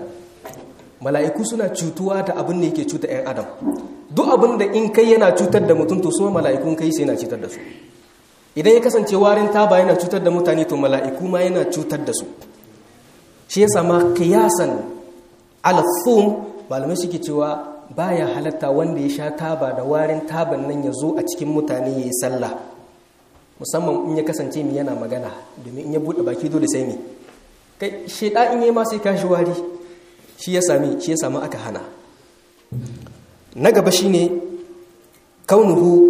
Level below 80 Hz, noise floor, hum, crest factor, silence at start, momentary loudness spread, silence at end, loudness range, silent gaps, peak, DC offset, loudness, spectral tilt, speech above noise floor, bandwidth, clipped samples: -60 dBFS; -52 dBFS; none; 18 dB; 0 s; 17 LU; 0 s; 7 LU; none; 0 dBFS; under 0.1%; -18 LUFS; -5.5 dB/octave; 34 dB; 15.5 kHz; under 0.1%